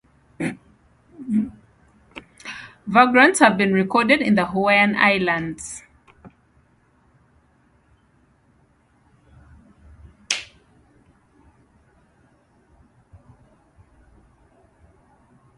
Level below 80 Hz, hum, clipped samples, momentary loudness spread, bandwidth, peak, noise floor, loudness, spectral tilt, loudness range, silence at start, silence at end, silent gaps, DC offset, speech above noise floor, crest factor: -58 dBFS; none; under 0.1%; 25 LU; 11.5 kHz; 0 dBFS; -60 dBFS; -18 LUFS; -4.5 dB/octave; 18 LU; 0.4 s; 5.15 s; none; under 0.1%; 42 dB; 24 dB